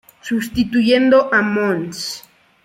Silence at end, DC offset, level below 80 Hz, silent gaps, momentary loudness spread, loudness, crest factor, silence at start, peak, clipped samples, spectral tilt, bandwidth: 0.45 s; under 0.1%; -48 dBFS; none; 13 LU; -17 LUFS; 16 dB; 0.25 s; -2 dBFS; under 0.1%; -5 dB/octave; 16.5 kHz